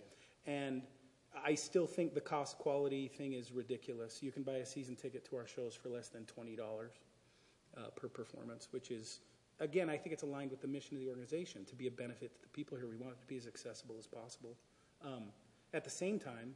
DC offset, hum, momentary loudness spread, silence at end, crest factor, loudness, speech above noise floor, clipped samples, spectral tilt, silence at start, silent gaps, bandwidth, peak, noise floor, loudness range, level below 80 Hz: under 0.1%; none; 15 LU; 0 s; 22 dB; -45 LUFS; 27 dB; under 0.1%; -5 dB/octave; 0 s; none; 11.5 kHz; -24 dBFS; -71 dBFS; 10 LU; -86 dBFS